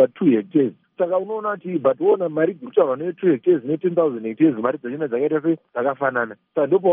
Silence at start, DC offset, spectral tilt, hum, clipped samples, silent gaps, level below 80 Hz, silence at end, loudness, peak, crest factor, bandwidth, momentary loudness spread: 0 s; under 0.1%; -7 dB/octave; none; under 0.1%; none; -72 dBFS; 0 s; -21 LUFS; -4 dBFS; 16 dB; 3.7 kHz; 7 LU